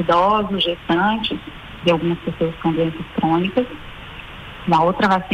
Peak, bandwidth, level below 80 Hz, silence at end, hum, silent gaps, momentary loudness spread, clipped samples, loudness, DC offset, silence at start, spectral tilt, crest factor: -6 dBFS; 10.5 kHz; -44 dBFS; 0 s; none; none; 19 LU; under 0.1%; -19 LUFS; under 0.1%; 0 s; -7 dB/octave; 14 dB